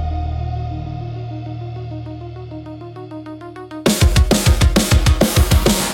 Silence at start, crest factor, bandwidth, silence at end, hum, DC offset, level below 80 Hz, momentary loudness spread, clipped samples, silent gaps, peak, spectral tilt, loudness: 0 s; 16 dB; 17 kHz; 0 s; none; under 0.1%; -22 dBFS; 18 LU; under 0.1%; none; -2 dBFS; -5 dB/octave; -17 LUFS